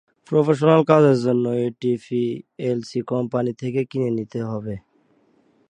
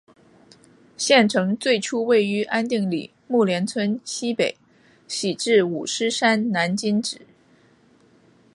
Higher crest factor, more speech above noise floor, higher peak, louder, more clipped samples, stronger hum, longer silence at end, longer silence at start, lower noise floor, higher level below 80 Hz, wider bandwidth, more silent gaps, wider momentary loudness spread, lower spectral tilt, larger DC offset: about the same, 20 dB vs 22 dB; first, 41 dB vs 35 dB; about the same, 0 dBFS vs -2 dBFS; about the same, -21 LUFS vs -21 LUFS; neither; neither; second, 0.9 s vs 1.4 s; second, 0.3 s vs 1 s; first, -61 dBFS vs -57 dBFS; first, -62 dBFS vs -70 dBFS; second, 9.8 kHz vs 11.5 kHz; neither; first, 13 LU vs 9 LU; first, -8 dB/octave vs -4 dB/octave; neither